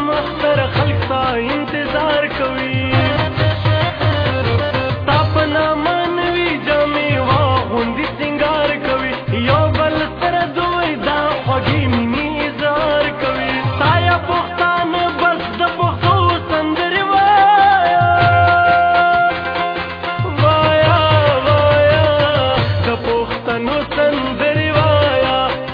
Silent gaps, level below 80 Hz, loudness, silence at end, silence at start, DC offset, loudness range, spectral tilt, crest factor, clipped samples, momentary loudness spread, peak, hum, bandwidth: none; -36 dBFS; -15 LUFS; 0 s; 0 s; under 0.1%; 4 LU; -8.5 dB/octave; 14 dB; under 0.1%; 7 LU; -2 dBFS; none; 5.2 kHz